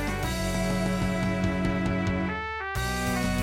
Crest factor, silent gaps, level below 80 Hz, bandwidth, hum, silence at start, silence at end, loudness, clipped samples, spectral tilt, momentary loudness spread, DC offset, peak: 14 dB; none; -38 dBFS; 16.5 kHz; none; 0 s; 0 s; -28 LUFS; under 0.1%; -5.5 dB/octave; 3 LU; under 0.1%; -12 dBFS